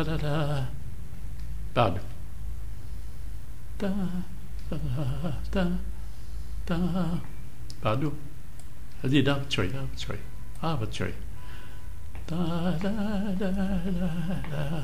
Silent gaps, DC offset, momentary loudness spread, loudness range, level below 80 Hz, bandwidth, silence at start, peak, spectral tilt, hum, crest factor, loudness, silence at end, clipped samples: none; 4%; 17 LU; 4 LU; -40 dBFS; 16 kHz; 0 s; -10 dBFS; -7 dB/octave; none; 22 dB; -31 LUFS; 0 s; under 0.1%